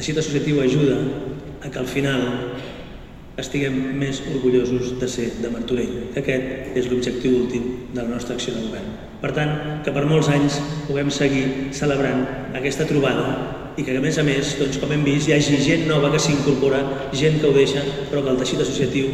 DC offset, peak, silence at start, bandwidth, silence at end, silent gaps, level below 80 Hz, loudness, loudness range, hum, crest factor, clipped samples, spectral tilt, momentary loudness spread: under 0.1%; -4 dBFS; 0 s; 13.5 kHz; 0 s; none; -42 dBFS; -21 LUFS; 5 LU; none; 16 dB; under 0.1%; -5.5 dB/octave; 10 LU